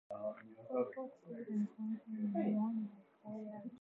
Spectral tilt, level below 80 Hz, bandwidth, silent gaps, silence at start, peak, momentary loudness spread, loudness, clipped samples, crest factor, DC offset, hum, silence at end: -9.5 dB/octave; under -90 dBFS; 3.8 kHz; none; 0.1 s; -24 dBFS; 13 LU; -42 LUFS; under 0.1%; 18 dB; under 0.1%; none; 0 s